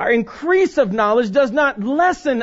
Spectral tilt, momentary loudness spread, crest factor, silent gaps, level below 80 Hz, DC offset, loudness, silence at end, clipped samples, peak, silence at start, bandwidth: -5.5 dB/octave; 3 LU; 14 dB; none; -50 dBFS; under 0.1%; -17 LUFS; 0 s; under 0.1%; -4 dBFS; 0 s; 8 kHz